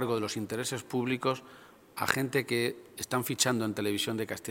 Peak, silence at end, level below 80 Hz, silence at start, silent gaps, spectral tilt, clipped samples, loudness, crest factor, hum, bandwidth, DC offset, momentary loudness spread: -4 dBFS; 0 s; -70 dBFS; 0 s; none; -3.5 dB/octave; under 0.1%; -31 LUFS; 28 dB; none; 17 kHz; under 0.1%; 7 LU